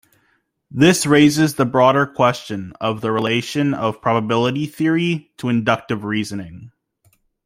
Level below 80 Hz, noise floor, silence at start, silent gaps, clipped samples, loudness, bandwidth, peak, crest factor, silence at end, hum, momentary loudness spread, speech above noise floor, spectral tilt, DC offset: -54 dBFS; -64 dBFS; 0.7 s; none; under 0.1%; -18 LUFS; 16 kHz; -2 dBFS; 16 dB; 0.8 s; none; 11 LU; 47 dB; -5.5 dB/octave; under 0.1%